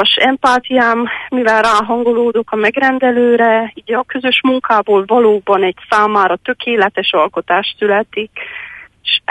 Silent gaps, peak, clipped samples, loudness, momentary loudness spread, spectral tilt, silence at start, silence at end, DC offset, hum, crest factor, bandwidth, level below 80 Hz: none; 0 dBFS; under 0.1%; -13 LUFS; 8 LU; -4 dB/octave; 0 s; 0.1 s; under 0.1%; none; 12 dB; 11.5 kHz; -54 dBFS